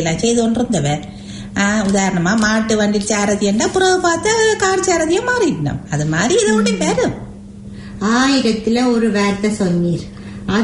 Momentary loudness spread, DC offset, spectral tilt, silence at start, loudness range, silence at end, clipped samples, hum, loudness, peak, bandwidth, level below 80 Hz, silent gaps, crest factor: 11 LU; under 0.1%; -4.5 dB/octave; 0 s; 2 LU; 0 s; under 0.1%; none; -16 LUFS; -2 dBFS; 11 kHz; -40 dBFS; none; 12 dB